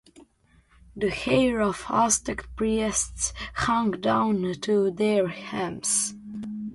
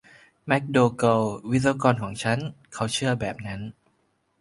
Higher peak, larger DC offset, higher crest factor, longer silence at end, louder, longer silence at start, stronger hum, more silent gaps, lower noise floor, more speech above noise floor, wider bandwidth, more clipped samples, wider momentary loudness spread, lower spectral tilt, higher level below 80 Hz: second, -8 dBFS vs -4 dBFS; neither; about the same, 18 dB vs 22 dB; second, 0 s vs 0.7 s; about the same, -25 LUFS vs -24 LUFS; second, 0.2 s vs 0.45 s; neither; neither; second, -61 dBFS vs -69 dBFS; second, 36 dB vs 45 dB; about the same, 11.5 kHz vs 11.5 kHz; neither; second, 8 LU vs 15 LU; second, -3.5 dB/octave vs -5.5 dB/octave; first, -48 dBFS vs -54 dBFS